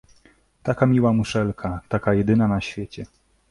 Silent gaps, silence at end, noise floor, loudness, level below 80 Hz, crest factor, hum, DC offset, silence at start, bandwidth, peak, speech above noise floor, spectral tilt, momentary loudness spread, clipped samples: none; 0.45 s; -57 dBFS; -22 LUFS; -44 dBFS; 18 dB; none; under 0.1%; 0.65 s; 11.5 kHz; -4 dBFS; 36 dB; -7.5 dB/octave; 15 LU; under 0.1%